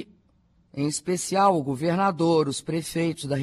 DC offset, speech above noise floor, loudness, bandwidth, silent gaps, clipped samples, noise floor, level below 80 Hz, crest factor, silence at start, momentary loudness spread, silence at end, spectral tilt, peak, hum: under 0.1%; 39 dB; -24 LUFS; 14 kHz; none; under 0.1%; -63 dBFS; -60 dBFS; 16 dB; 0 s; 8 LU; 0 s; -5.5 dB/octave; -8 dBFS; none